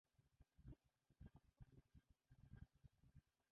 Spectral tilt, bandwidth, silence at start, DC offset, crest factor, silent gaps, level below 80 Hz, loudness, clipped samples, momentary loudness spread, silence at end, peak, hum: -8.5 dB/octave; 3.8 kHz; 0.15 s; under 0.1%; 22 dB; none; -74 dBFS; -68 LUFS; under 0.1%; 2 LU; 0.2 s; -48 dBFS; none